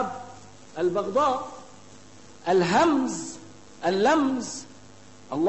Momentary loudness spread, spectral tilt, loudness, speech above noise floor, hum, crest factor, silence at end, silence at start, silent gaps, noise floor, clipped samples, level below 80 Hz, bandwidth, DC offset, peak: 19 LU; -4.5 dB/octave; -25 LUFS; 27 dB; none; 16 dB; 0 s; 0 s; none; -50 dBFS; under 0.1%; -62 dBFS; 8.6 kHz; 0.3%; -10 dBFS